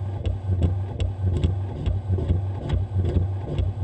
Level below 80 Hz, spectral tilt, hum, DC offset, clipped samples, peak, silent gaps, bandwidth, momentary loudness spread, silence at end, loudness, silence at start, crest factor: -32 dBFS; -9 dB/octave; none; under 0.1%; under 0.1%; -8 dBFS; none; 8.4 kHz; 4 LU; 0 s; -26 LUFS; 0 s; 16 dB